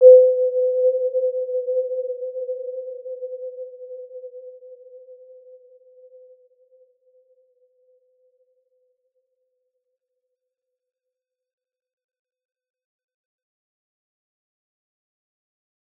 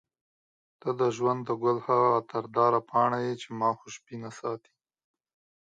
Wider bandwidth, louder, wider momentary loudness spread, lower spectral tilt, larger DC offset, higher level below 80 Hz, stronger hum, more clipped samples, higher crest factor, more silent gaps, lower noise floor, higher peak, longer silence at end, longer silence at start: second, 0.7 kHz vs 9.2 kHz; first, -21 LUFS vs -28 LUFS; first, 22 LU vs 14 LU; first, -8 dB/octave vs -6.5 dB/octave; neither; second, under -90 dBFS vs -76 dBFS; neither; neither; about the same, 24 dB vs 20 dB; neither; second, -86 dBFS vs under -90 dBFS; first, -2 dBFS vs -10 dBFS; first, 10.85 s vs 1.1 s; second, 0 s vs 0.85 s